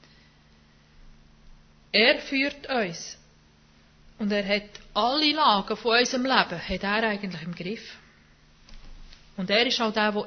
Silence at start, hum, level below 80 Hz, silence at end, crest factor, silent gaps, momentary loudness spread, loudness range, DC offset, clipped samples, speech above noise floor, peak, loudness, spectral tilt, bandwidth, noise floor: 1.05 s; none; -54 dBFS; 0 s; 24 dB; none; 15 LU; 5 LU; under 0.1%; under 0.1%; 32 dB; -4 dBFS; -24 LUFS; -3.5 dB/octave; 6.6 kHz; -57 dBFS